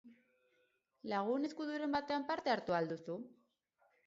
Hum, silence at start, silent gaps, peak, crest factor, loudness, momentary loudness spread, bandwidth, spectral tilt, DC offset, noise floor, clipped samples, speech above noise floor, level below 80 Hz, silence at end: none; 0.05 s; none; -22 dBFS; 18 dB; -39 LUFS; 11 LU; 7.6 kHz; -3.5 dB/octave; under 0.1%; -79 dBFS; under 0.1%; 40 dB; -78 dBFS; 0.75 s